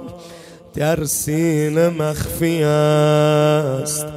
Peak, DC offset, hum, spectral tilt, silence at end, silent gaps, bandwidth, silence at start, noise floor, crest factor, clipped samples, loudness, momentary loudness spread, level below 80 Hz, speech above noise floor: -4 dBFS; under 0.1%; none; -5.5 dB/octave; 0 s; none; 16 kHz; 0 s; -39 dBFS; 14 dB; under 0.1%; -17 LUFS; 8 LU; -44 dBFS; 23 dB